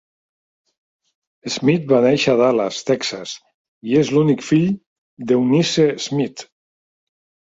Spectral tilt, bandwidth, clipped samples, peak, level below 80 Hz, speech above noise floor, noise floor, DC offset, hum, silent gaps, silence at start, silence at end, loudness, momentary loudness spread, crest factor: -5.5 dB/octave; 7.8 kHz; under 0.1%; -2 dBFS; -60 dBFS; over 73 dB; under -90 dBFS; under 0.1%; none; 3.54-3.81 s, 4.87-5.17 s; 1.45 s; 1.1 s; -18 LUFS; 17 LU; 16 dB